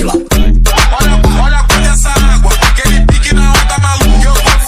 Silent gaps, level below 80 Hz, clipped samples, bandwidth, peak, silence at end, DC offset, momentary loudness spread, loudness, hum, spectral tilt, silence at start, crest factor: none; -8 dBFS; under 0.1%; 16 kHz; 0 dBFS; 0 s; under 0.1%; 2 LU; -9 LUFS; none; -4 dB/octave; 0 s; 6 dB